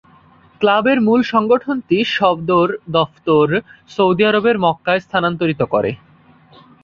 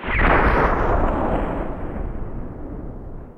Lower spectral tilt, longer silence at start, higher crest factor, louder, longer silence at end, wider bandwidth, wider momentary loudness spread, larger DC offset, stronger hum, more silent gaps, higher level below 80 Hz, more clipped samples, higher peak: second, -7 dB/octave vs -8.5 dB/octave; first, 0.6 s vs 0 s; about the same, 16 dB vs 18 dB; first, -16 LUFS vs -21 LUFS; first, 0.9 s vs 0 s; first, 7 kHz vs 5.8 kHz; second, 5 LU vs 18 LU; neither; neither; neither; second, -54 dBFS vs -26 dBFS; neither; about the same, -2 dBFS vs -4 dBFS